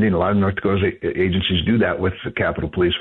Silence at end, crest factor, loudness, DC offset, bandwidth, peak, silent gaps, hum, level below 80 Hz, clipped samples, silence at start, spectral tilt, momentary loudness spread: 0 s; 12 dB; -20 LUFS; 0.1%; 4.2 kHz; -8 dBFS; none; none; -42 dBFS; under 0.1%; 0 s; -9.5 dB/octave; 5 LU